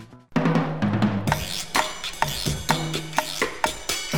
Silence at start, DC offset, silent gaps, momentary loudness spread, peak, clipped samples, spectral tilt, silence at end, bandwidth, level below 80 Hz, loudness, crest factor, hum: 0 s; 0.9%; none; 4 LU; -4 dBFS; under 0.1%; -4 dB/octave; 0 s; over 20 kHz; -44 dBFS; -25 LUFS; 22 dB; none